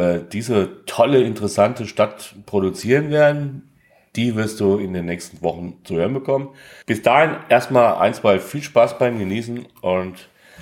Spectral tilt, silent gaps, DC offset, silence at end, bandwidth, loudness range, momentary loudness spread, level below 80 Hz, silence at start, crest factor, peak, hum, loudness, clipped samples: -6 dB/octave; none; under 0.1%; 0 s; 16.5 kHz; 5 LU; 11 LU; -56 dBFS; 0 s; 18 dB; -2 dBFS; none; -19 LUFS; under 0.1%